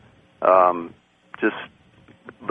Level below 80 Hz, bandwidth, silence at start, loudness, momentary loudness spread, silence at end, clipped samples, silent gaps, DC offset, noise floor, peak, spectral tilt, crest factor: -64 dBFS; 4.6 kHz; 0.4 s; -20 LUFS; 22 LU; 0 s; under 0.1%; none; under 0.1%; -53 dBFS; -2 dBFS; -7.5 dB/octave; 20 dB